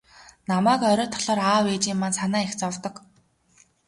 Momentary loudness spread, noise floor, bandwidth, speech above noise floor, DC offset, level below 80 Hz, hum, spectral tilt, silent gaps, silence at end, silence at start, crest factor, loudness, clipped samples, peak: 11 LU; -60 dBFS; 11.5 kHz; 37 dB; under 0.1%; -62 dBFS; none; -4 dB/octave; none; 0.9 s; 0.5 s; 18 dB; -23 LUFS; under 0.1%; -8 dBFS